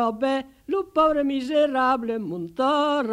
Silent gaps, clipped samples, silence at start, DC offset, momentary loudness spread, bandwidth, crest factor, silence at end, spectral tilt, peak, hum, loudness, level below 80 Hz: none; under 0.1%; 0 s; under 0.1%; 8 LU; 11.5 kHz; 16 dB; 0 s; -5.5 dB/octave; -8 dBFS; none; -23 LUFS; -56 dBFS